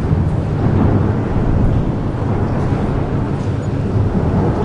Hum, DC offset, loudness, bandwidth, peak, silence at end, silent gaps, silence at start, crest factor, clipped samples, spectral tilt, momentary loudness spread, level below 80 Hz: none; under 0.1%; -17 LUFS; 8 kHz; -2 dBFS; 0 s; none; 0 s; 12 dB; under 0.1%; -9.5 dB/octave; 5 LU; -24 dBFS